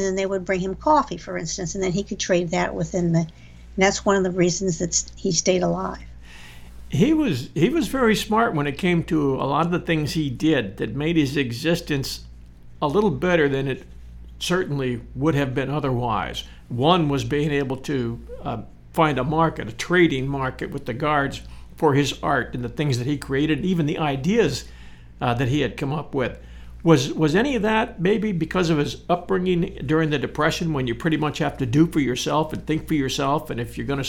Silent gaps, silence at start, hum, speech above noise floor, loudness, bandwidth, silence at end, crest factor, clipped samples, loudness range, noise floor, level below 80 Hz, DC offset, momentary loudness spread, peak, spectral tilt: none; 0 s; none; 20 dB; -22 LUFS; 17 kHz; 0 s; 20 dB; under 0.1%; 2 LU; -42 dBFS; -42 dBFS; under 0.1%; 9 LU; -2 dBFS; -5.5 dB/octave